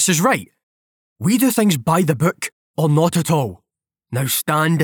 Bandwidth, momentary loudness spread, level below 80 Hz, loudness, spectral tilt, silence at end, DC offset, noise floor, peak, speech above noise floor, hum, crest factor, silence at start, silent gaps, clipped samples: over 20 kHz; 10 LU; -60 dBFS; -18 LUFS; -5 dB/octave; 0 s; under 0.1%; -74 dBFS; -4 dBFS; 58 dB; none; 16 dB; 0 s; 0.63-1.16 s, 2.52-2.74 s; under 0.1%